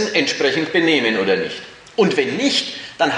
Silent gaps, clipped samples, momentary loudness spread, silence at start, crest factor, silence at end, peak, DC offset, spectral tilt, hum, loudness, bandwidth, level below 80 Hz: none; under 0.1%; 11 LU; 0 s; 16 dB; 0 s; -2 dBFS; under 0.1%; -3.5 dB/octave; none; -18 LUFS; 10.5 kHz; -62 dBFS